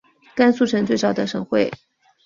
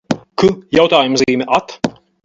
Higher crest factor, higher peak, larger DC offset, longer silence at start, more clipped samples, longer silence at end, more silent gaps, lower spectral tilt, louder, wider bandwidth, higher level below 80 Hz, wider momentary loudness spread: about the same, 18 dB vs 14 dB; about the same, -2 dBFS vs 0 dBFS; neither; first, 0.35 s vs 0.1 s; neither; first, 0.5 s vs 0.35 s; neither; about the same, -5.5 dB/octave vs -4.5 dB/octave; second, -20 LUFS vs -14 LUFS; about the same, 7.4 kHz vs 7.8 kHz; second, -60 dBFS vs -48 dBFS; about the same, 10 LU vs 12 LU